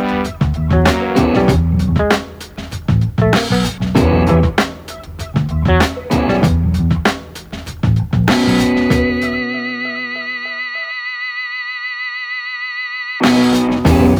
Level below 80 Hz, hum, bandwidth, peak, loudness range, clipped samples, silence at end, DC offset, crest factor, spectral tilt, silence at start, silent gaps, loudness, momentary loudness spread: -26 dBFS; none; over 20 kHz; 0 dBFS; 5 LU; under 0.1%; 0 s; under 0.1%; 14 dB; -6.5 dB/octave; 0 s; none; -16 LUFS; 9 LU